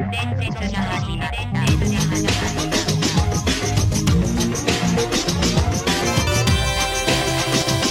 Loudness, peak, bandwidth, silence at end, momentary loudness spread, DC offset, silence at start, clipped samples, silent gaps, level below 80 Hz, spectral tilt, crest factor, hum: -19 LUFS; -2 dBFS; 16.5 kHz; 0 s; 5 LU; under 0.1%; 0 s; under 0.1%; none; -30 dBFS; -4 dB/octave; 16 dB; none